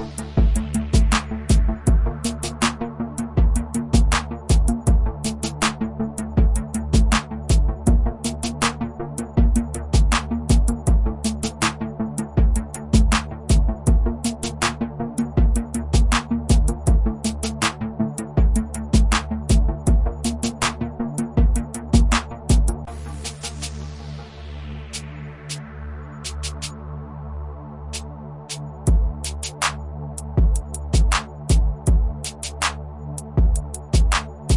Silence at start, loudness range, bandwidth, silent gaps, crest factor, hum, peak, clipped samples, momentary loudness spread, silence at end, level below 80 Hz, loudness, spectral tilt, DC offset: 0 s; 10 LU; 11.5 kHz; none; 16 dB; none; -4 dBFS; under 0.1%; 13 LU; 0 s; -22 dBFS; -22 LUFS; -5 dB/octave; under 0.1%